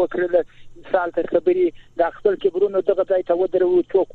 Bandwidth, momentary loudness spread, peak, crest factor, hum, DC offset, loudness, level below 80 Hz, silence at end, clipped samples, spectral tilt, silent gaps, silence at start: 4.3 kHz; 5 LU; -4 dBFS; 16 dB; none; under 0.1%; -20 LUFS; -52 dBFS; 0 s; under 0.1%; -8 dB/octave; none; 0 s